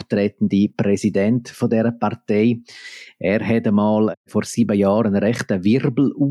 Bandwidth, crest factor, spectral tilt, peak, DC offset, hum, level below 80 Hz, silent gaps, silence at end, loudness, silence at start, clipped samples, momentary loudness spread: 12.5 kHz; 12 dB; -7 dB/octave; -6 dBFS; under 0.1%; none; -62 dBFS; 4.17-4.24 s; 0 s; -19 LUFS; 0 s; under 0.1%; 8 LU